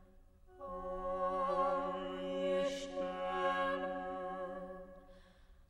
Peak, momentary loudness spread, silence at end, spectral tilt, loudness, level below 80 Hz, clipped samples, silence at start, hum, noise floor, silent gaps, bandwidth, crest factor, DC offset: -24 dBFS; 14 LU; 0.05 s; -5 dB/octave; -38 LUFS; -60 dBFS; under 0.1%; 0 s; none; -62 dBFS; none; 11 kHz; 16 dB; under 0.1%